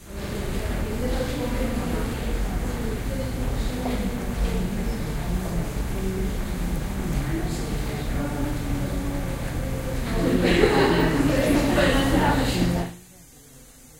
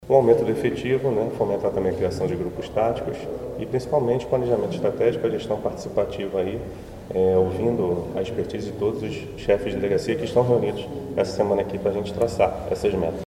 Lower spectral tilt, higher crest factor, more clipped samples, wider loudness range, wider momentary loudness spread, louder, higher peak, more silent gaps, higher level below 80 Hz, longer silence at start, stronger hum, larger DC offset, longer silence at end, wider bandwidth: second, -5.5 dB/octave vs -7 dB/octave; about the same, 20 dB vs 20 dB; neither; first, 7 LU vs 2 LU; about the same, 9 LU vs 9 LU; about the same, -25 LUFS vs -24 LUFS; about the same, -4 dBFS vs -4 dBFS; neither; first, -30 dBFS vs -46 dBFS; about the same, 0 s vs 0 s; neither; neither; about the same, 0 s vs 0 s; about the same, 16 kHz vs 15.5 kHz